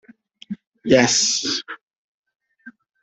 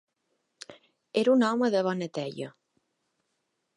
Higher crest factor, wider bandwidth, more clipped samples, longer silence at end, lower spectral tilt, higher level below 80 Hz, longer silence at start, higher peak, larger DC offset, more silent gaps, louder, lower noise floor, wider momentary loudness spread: about the same, 22 dB vs 18 dB; second, 8.4 kHz vs 11 kHz; neither; second, 0.3 s vs 1.3 s; second, -2.5 dB/octave vs -6 dB/octave; first, -60 dBFS vs -82 dBFS; second, 0.5 s vs 0.7 s; first, -2 dBFS vs -12 dBFS; neither; first, 0.67-0.72 s, 1.81-2.24 s, 2.35-2.39 s vs none; first, -17 LUFS vs -27 LUFS; second, -47 dBFS vs -79 dBFS; about the same, 22 LU vs 24 LU